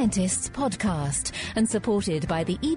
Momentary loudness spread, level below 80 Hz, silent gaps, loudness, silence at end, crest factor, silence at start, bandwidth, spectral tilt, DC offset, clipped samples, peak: 3 LU; -44 dBFS; none; -26 LUFS; 0 s; 12 dB; 0 s; 11 kHz; -4.5 dB/octave; under 0.1%; under 0.1%; -14 dBFS